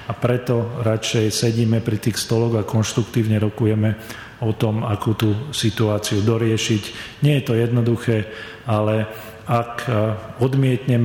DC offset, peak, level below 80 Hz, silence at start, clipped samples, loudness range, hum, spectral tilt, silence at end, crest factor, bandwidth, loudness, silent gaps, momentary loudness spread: under 0.1%; -6 dBFS; -50 dBFS; 0 s; under 0.1%; 1 LU; none; -6 dB/octave; 0 s; 14 dB; 17 kHz; -20 LUFS; none; 5 LU